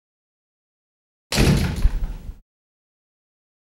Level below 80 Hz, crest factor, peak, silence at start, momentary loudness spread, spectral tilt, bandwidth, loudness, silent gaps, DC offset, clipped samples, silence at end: -28 dBFS; 22 dB; -4 dBFS; 1.3 s; 20 LU; -5 dB/octave; 16 kHz; -21 LUFS; none; under 0.1%; under 0.1%; 1.25 s